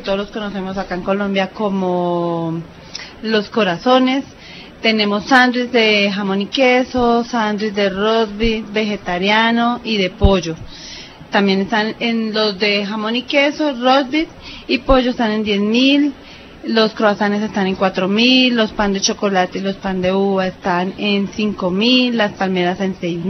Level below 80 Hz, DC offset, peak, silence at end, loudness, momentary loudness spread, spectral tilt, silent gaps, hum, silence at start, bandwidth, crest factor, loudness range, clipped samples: -34 dBFS; under 0.1%; 0 dBFS; 0 s; -16 LUFS; 10 LU; -5 dB/octave; none; none; 0 s; 6.4 kHz; 16 dB; 3 LU; under 0.1%